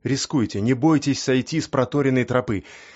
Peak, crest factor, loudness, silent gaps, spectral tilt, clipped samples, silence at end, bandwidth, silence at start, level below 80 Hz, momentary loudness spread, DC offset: -6 dBFS; 16 dB; -21 LUFS; none; -5.5 dB/octave; under 0.1%; 0.1 s; 8 kHz; 0.05 s; -52 dBFS; 5 LU; under 0.1%